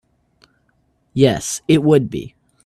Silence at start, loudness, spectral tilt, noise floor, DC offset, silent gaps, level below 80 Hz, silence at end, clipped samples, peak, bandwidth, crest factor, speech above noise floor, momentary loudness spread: 1.15 s; -16 LUFS; -5.5 dB/octave; -63 dBFS; under 0.1%; none; -50 dBFS; 0.35 s; under 0.1%; 0 dBFS; 14 kHz; 18 dB; 47 dB; 16 LU